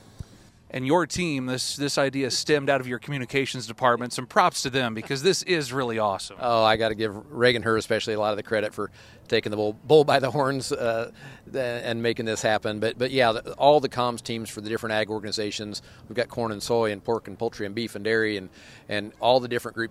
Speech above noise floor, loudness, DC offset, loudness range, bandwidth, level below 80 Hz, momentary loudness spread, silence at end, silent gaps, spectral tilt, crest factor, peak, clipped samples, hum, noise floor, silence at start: 26 dB; -25 LUFS; under 0.1%; 4 LU; 15 kHz; -58 dBFS; 10 LU; 0 s; none; -4 dB/octave; 22 dB; -4 dBFS; under 0.1%; none; -51 dBFS; 0.75 s